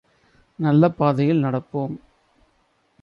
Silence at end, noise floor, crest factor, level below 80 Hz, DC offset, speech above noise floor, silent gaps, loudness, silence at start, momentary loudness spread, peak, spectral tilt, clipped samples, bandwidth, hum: 1.05 s; -65 dBFS; 18 dB; -60 dBFS; under 0.1%; 45 dB; none; -21 LUFS; 0.6 s; 12 LU; -6 dBFS; -10 dB/octave; under 0.1%; 5.6 kHz; none